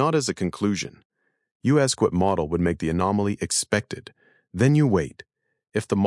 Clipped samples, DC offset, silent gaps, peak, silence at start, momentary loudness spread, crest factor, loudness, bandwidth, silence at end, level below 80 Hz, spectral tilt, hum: under 0.1%; under 0.1%; 1.05-1.10 s, 1.51-1.60 s; -6 dBFS; 0 s; 12 LU; 18 dB; -23 LUFS; 12 kHz; 0 s; -54 dBFS; -5.5 dB/octave; none